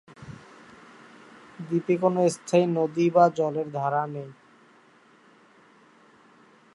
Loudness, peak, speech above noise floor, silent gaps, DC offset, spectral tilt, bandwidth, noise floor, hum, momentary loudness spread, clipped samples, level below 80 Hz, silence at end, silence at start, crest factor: -24 LUFS; -6 dBFS; 34 dB; none; under 0.1%; -7 dB/octave; 11.5 kHz; -57 dBFS; none; 24 LU; under 0.1%; -72 dBFS; 2.45 s; 0.2 s; 22 dB